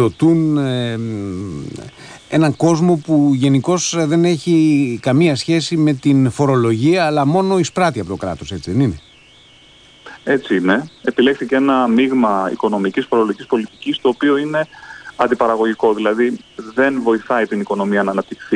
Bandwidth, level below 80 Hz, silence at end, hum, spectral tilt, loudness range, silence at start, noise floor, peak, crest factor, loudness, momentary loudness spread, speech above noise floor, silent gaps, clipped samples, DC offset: 10.5 kHz; -52 dBFS; 0 s; none; -6 dB/octave; 4 LU; 0 s; -46 dBFS; -2 dBFS; 14 dB; -16 LUFS; 10 LU; 30 dB; none; under 0.1%; under 0.1%